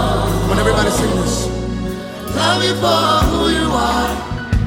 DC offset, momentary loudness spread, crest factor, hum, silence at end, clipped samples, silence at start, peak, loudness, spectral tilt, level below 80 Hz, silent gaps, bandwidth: under 0.1%; 9 LU; 14 dB; none; 0 s; under 0.1%; 0 s; -2 dBFS; -16 LUFS; -4.5 dB/octave; -26 dBFS; none; 17 kHz